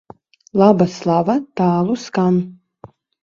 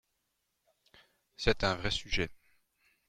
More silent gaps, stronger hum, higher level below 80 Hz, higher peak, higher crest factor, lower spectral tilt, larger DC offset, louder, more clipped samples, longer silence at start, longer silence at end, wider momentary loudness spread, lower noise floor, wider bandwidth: neither; neither; second, -58 dBFS vs -46 dBFS; first, 0 dBFS vs -12 dBFS; second, 18 dB vs 26 dB; first, -8 dB/octave vs -4 dB/octave; neither; first, -17 LUFS vs -33 LUFS; neither; second, 0.55 s vs 1.4 s; about the same, 0.7 s vs 0.75 s; about the same, 7 LU vs 5 LU; second, -45 dBFS vs -81 dBFS; second, 7.4 kHz vs 11 kHz